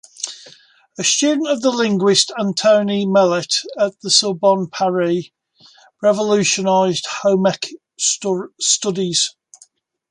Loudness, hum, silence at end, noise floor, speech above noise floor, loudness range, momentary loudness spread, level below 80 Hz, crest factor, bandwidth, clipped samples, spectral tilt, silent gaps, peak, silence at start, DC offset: -17 LUFS; none; 0.8 s; -53 dBFS; 36 dB; 3 LU; 7 LU; -66 dBFS; 18 dB; 11.5 kHz; under 0.1%; -3 dB/octave; none; 0 dBFS; 0.2 s; under 0.1%